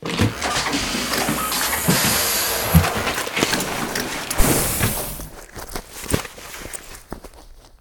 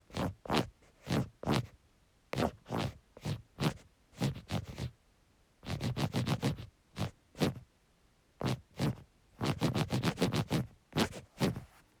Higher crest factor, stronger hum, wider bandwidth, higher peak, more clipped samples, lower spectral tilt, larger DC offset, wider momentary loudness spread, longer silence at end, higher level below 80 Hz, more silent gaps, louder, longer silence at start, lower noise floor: about the same, 22 dB vs 24 dB; neither; about the same, over 20 kHz vs over 20 kHz; first, 0 dBFS vs -12 dBFS; neither; second, -3 dB/octave vs -6 dB/octave; neither; first, 17 LU vs 12 LU; second, 0.05 s vs 0.35 s; first, -32 dBFS vs -56 dBFS; neither; first, -20 LUFS vs -36 LUFS; about the same, 0 s vs 0.1 s; second, -44 dBFS vs -69 dBFS